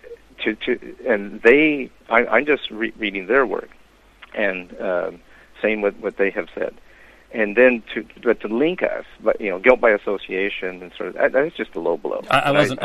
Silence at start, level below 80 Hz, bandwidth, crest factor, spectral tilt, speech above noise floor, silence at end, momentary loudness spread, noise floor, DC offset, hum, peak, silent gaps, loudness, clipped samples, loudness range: 0.05 s; -52 dBFS; 12.5 kHz; 20 dB; -5.5 dB/octave; 28 dB; 0 s; 13 LU; -48 dBFS; under 0.1%; none; 0 dBFS; none; -20 LUFS; under 0.1%; 6 LU